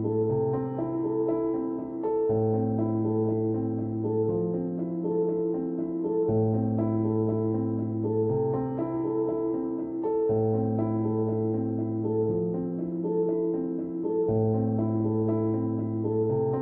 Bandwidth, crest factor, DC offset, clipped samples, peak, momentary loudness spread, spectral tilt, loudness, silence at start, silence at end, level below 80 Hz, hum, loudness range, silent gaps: 2.5 kHz; 12 dB; under 0.1%; under 0.1%; -14 dBFS; 5 LU; -14.5 dB/octave; -28 LUFS; 0 s; 0 s; -58 dBFS; none; 1 LU; none